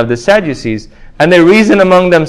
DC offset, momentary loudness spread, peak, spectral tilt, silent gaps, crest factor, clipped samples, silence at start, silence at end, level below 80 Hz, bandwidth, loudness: under 0.1%; 13 LU; 0 dBFS; -6 dB/octave; none; 8 dB; 2%; 0 s; 0 s; -38 dBFS; 12.5 kHz; -8 LUFS